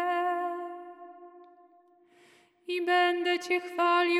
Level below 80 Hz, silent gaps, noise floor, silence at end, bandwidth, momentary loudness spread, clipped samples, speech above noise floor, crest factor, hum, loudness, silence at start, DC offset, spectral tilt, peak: under -90 dBFS; none; -62 dBFS; 0 s; 12.5 kHz; 22 LU; under 0.1%; 35 dB; 18 dB; none; -28 LUFS; 0 s; under 0.1%; -1.5 dB/octave; -14 dBFS